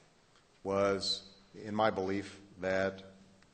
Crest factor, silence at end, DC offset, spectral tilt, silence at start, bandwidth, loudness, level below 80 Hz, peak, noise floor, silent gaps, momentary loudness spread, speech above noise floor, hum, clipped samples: 22 dB; 0.4 s; under 0.1%; -4.5 dB/octave; 0.65 s; 9.2 kHz; -34 LUFS; -68 dBFS; -14 dBFS; -66 dBFS; none; 17 LU; 32 dB; none; under 0.1%